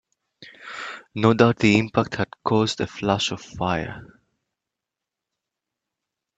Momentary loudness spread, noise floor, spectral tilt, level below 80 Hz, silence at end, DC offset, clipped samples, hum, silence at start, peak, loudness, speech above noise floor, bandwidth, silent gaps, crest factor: 17 LU; -86 dBFS; -5.5 dB/octave; -54 dBFS; 2.35 s; under 0.1%; under 0.1%; none; 0.4 s; -2 dBFS; -22 LUFS; 65 dB; 8.4 kHz; none; 22 dB